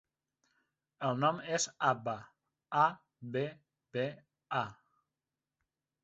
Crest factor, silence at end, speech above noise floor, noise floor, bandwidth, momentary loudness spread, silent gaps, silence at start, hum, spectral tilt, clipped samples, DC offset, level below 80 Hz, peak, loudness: 22 dB; 1.3 s; over 56 dB; under -90 dBFS; 8 kHz; 12 LU; none; 1 s; none; -4 dB/octave; under 0.1%; under 0.1%; -78 dBFS; -14 dBFS; -35 LUFS